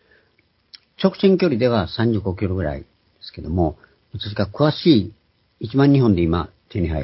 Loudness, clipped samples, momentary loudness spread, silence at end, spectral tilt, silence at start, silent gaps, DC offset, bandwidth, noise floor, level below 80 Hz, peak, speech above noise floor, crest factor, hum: -19 LUFS; under 0.1%; 18 LU; 0 s; -11.5 dB/octave; 1 s; none; under 0.1%; 5.8 kHz; -62 dBFS; -36 dBFS; -2 dBFS; 44 dB; 18 dB; none